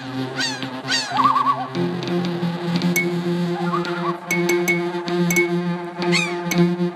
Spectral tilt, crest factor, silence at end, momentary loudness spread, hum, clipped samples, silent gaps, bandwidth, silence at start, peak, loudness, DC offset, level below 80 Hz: -5 dB/octave; 16 dB; 0 s; 6 LU; none; under 0.1%; none; 14.5 kHz; 0 s; -6 dBFS; -21 LUFS; under 0.1%; -64 dBFS